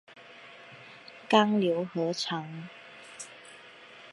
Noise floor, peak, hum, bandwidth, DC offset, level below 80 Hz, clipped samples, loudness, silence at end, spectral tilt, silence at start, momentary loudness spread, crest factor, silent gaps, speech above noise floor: -51 dBFS; -8 dBFS; none; 11.5 kHz; under 0.1%; -80 dBFS; under 0.1%; -27 LUFS; 0 s; -5 dB/octave; 0.1 s; 25 LU; 24 dB; none; 23 dB